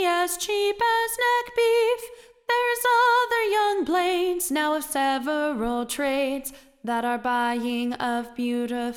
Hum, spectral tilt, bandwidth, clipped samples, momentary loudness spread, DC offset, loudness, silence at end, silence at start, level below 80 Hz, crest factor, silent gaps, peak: none; -2 dB/octave; 18 kHz; under 0.1%; 7 LU; under 0.1%; -24 LUFS; 0 s; 0 s; -56 dBFS; 14 dB; none; -10 dBFS